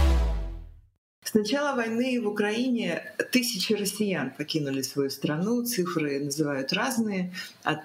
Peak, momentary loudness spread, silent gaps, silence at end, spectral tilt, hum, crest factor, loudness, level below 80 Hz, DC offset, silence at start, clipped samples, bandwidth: -8 dBFS; 6 LU; 0.98-1.22 s; 0 s; -4.5 dB/octave; none; 20 dB; -28 LUFS; -36 dBFS; under 0.1%; 0 s; under 0.1%; 16 kHz